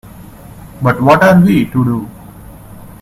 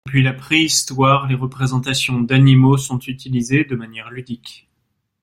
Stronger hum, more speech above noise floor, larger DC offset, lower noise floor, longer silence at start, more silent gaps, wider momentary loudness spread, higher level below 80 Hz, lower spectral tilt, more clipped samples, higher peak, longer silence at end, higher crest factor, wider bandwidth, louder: neither; second, 24 dB vs 54 dB; neither; second, -34 dBFS vs -70 dBFS; about the same, 0.15 s vs 0.05 s; neither; second, 12 LU vs 18 LU; first, -40 dBFS vs -50 dBFS; first, -7.5 dB/octave vs -5 dB/octave; first, 0.1% vs under 0.1%; about the same, 0 dBFS vs -2 dBFS; second, 0.1 s vs 0.7 s; about the same, 14 dB vs 16 dB; about the same, 14.5 kHz vs 15.5 kHz; first, -11 LUFS vs -16 LUFS